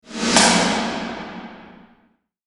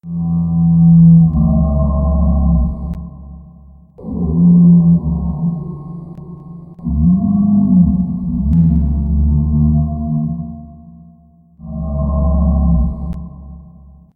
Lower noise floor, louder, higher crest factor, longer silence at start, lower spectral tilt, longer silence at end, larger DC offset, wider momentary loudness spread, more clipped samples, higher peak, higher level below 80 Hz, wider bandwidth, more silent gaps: first, -62 dBFS vs -46 dBFS; second, -17 LUFS vs -13 LUFS; first, 22 dB vs 12 dB; about the same, 0.1 s vs 0.05 s; second, -2.5 dB/octave vs -15 dB/octave; first, 0.75 s vs 0.55 s; neither; about the same, 22 LU vs 21 LU; neither; about the same, 0 dBFS vs 0 dBFS; second, -50 dBFS vs -20 dBFS; first, 11.5 kHz vs 1.2 kHz; neither